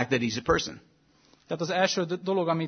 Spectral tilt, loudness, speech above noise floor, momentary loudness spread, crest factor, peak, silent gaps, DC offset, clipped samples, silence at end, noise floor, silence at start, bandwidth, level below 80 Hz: -4.5 dB/octave; -28 LUFS; 35 dB; 9 LU; 20 dB; -8 dBFS; none; under 0.1%; under 0.1%; 0 s; -62 dBFS; 0 s; 6.6 kHz; -52 dBFS